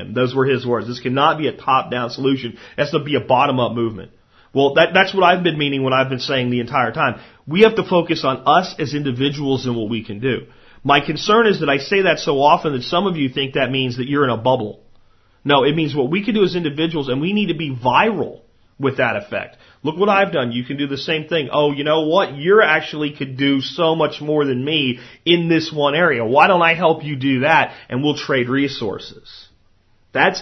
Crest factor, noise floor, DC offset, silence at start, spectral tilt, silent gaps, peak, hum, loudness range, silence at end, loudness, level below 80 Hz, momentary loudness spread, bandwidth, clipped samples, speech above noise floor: 18 dB; -55 dBFS; under 0.1%; 0 s; -6 dB/octave; none; 0 dBFS; none; 3 LU; 0 s; -17 LUFS; -54 dBFS; 10 LU; 6.2 kHz; under 0.1%; 38 dB